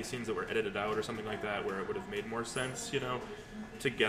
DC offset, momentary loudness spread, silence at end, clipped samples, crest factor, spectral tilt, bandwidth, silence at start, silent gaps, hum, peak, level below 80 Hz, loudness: under 0.1%; 5 LU; 0 s; under 0.1%; 22 dB; -4 dB/octave; 15.5 kHz; 0 s; none; none; -14 dBFS; -58 dBFS; -37 LUFS